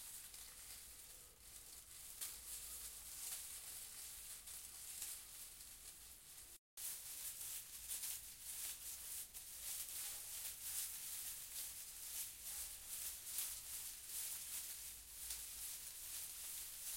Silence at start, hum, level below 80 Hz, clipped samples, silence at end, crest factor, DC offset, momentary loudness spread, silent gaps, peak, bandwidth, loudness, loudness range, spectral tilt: 0 s; none; -72 dBFS; under 0.1%; 0 s; 26 dB; under 0.1%; 10 LU; 6.58-6.77 s; -26 dBFS; 16.5 kHz; -48 LUFS; 4 LU; 1.5 dB/octave